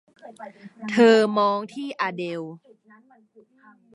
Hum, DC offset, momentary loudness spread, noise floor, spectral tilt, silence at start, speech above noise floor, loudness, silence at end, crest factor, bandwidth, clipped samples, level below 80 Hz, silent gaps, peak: none; under 0.1%; 26 LU; -56 dBFS; -5.5 dB/octave; 0.25 s; 34 dB; -21 LUFS; 1.4 s; 20 dB; 11 kHz; under 0.1%; -80 dBFS; none; -4 dBFS